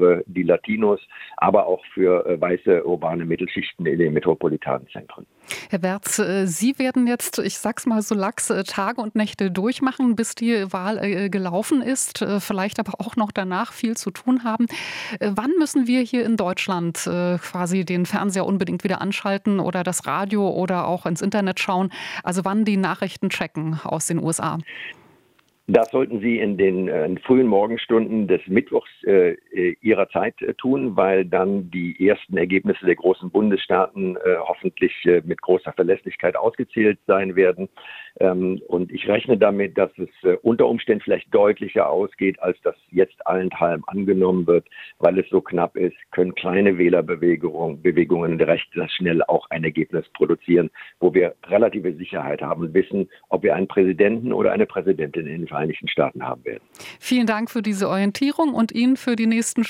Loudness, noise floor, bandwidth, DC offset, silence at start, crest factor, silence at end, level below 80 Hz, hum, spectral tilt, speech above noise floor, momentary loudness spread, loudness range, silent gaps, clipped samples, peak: -21 LUFS; -60 dBFS; 16.5 kHz; under 0.1%; 0 s; 20 dB; 0 s; -62 dBFS; none; -5.5 dB/octave; 40 dB; 7 LU; 4 LU; none; under 0.1%; -2 dBFS